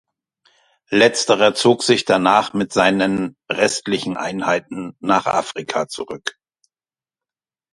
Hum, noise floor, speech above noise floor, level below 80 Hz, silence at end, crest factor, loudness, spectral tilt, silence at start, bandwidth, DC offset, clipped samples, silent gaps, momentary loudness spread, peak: none; under -90 dBFS; over 72 dB; -58 dBFS; 1.4 s; 20 dB; -18 LUFS; -3.5 dB/octave; 0.9 s; 11.5 kHz; under 0.1%; under 0.1%; none; 12 LU; 0 dBFS